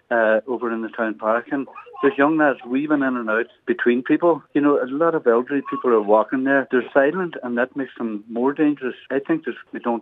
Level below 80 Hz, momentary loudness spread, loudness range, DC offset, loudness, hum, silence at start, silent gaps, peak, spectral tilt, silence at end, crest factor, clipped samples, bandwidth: -80 dBFS; 9 LU; 3 LU; under 0.1%; -21 LUFS; none; 0.1 s; none; -2 dBFS; -8.5 dB/octave; 0 s; 18 dB; under 0.1%; 4 kHz